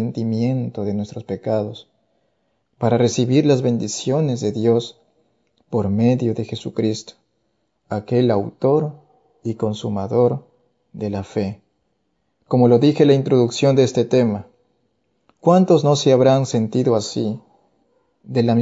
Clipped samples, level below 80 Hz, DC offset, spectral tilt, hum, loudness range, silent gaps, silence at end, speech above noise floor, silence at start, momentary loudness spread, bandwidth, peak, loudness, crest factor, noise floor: under 0.1%; -62 dBFS; under 0.1%; -7 dB/octave; none; 6 LU; none; 0 s; 52 dB; 0 s; 14 LU; 8 kHz; -2 dBFS; -19 LUFS; 18 dB; -70 dBFS